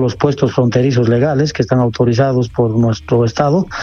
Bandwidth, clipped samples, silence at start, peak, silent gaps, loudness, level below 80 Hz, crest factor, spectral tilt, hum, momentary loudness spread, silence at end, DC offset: 7 kHz; under 0.1%; 0 s; 0 dBFS; none; -14 LUFS; -40 dBFS; 12 dB; -7.5 dB/octave; none; 2 LU; 0 s; under 0.1%